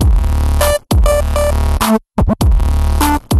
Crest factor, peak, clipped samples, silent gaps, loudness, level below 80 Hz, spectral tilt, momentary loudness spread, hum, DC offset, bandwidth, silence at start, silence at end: 10 dB; -2 dBFS; under 0.1%; none; -14 LUFS; -14 dBFS; -5.5 dB/octave; 2 LU; none; under 0.1%; 13 kHz; 0 s; 0 s